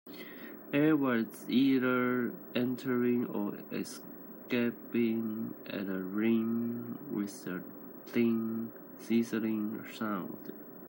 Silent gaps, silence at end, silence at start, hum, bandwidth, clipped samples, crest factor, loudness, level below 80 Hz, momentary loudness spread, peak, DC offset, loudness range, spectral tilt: none; 0 s; 0.05 s; none; 16 kHz; under 0.1%; 16 dB; -33 LUFS; -82 dBFS; 16 LU; -16 dBFS; under 0.1%; 4 LU; -6.5 dB/octave